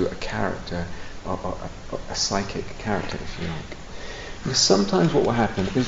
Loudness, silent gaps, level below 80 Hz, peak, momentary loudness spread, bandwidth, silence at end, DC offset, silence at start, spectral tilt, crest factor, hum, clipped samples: -24 LUFS; none; -40 dBFS; -4 dBFS; 17 LU; 8 kHz; 0 s; under 0.1%; 0 s; -4 dB/octave; 20 dB; none; under 0.1%